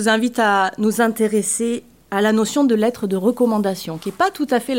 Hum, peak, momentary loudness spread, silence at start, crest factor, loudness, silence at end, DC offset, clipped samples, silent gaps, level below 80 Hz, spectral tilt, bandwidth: none; -4 dBFS; 7 LU; 0 s; 14 dB; -19 LUFS; 0 s; 0.1%; under 0.1%; none; -60 dBFS; -4 dB/octave; 16.5 kHz